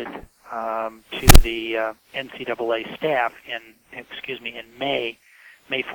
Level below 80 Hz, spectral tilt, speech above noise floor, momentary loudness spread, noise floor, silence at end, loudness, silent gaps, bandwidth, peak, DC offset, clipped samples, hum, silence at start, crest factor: -24 dBFS; -4 dB/octave; 18 dB; 20 LU; -37 dBFS; 0 s; -23 LUFS; none; 19.5 kHz; 0 dBFS; under 0.1%; under 0.1%; none; 0 s; 20 dB